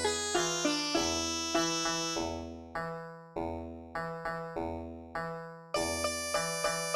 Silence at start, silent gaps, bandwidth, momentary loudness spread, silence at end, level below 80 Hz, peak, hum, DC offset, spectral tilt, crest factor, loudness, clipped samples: 0 s; none; 16 kHz; 12 LU; 0 s; -56 dBFS; -16 dBFS; none; under 0.1%; -2.5 dB/octave; 18 dB; -33 LUFS; under 0.1%